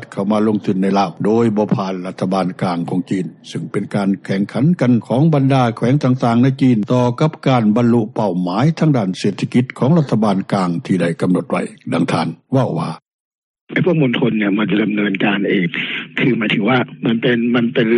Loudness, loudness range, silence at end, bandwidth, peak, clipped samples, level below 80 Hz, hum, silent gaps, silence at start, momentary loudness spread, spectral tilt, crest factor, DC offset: -16 LUFS; 4 LU; 0 s; 11 kHz; -2 dBFS; under 0.1%; -58 dBFS; none; 13.14-13.54 s, 13.61-13.67 s; 0 s; 7 LU; -7.5 dB/octave; 14 dB; under 0.1%